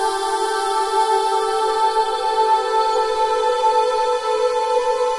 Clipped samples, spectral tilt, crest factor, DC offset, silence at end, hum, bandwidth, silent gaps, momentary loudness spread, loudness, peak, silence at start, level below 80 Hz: under 0.1%; -0.5 dB/octave; 12 dB; under 0.1%; 0 s; none; 11.5 kHz; none; 3 LU; -18 LUFS; -6 dBFS; 0 s; -54 dBFS